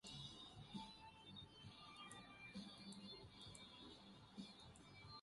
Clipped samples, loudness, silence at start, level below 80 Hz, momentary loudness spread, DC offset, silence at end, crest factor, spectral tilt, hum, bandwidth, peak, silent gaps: under 0.1%; -58 LUFS; 0.05 s; -76 dBFS; 5 LU; under 0.1%; 0 s; 20 dB; -4 dB/octave; none; 11.5 kHz; -40 dBFS; none